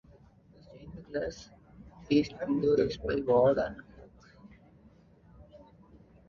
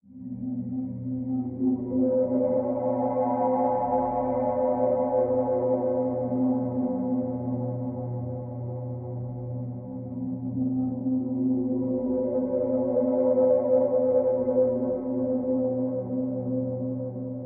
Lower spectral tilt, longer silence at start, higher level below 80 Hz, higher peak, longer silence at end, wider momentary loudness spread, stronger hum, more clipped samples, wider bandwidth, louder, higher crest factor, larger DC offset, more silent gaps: second, -7 dB/octave vs -9 dB/octave; first, 0.75 s vs 0.1 s; about the same, -56 dBFS vs -58 dBFS; about the same, -14 dBFS vs -12 dBFS; first, 0.7 s vs 0 s; first, 24 LU vs 11 LU; neither; neither; first, 7.2 kHz vs 2.4 kHz; about the same, -29 LUFS vs -27 LUFS; first, 20 dB vs 14 dB; neither; neither